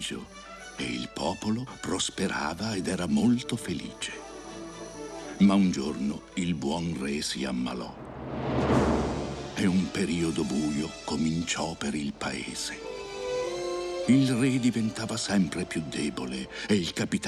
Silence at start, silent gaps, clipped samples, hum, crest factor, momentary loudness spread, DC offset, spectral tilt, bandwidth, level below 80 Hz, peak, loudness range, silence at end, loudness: 0 s; none; under 0.1%; none; 18 dB; 13 LU; under 0.1%; -5 dB/octave; 13 kHz; -48 dBFS; -12 dBFS; 3 LU; 0 s; -29 LUFS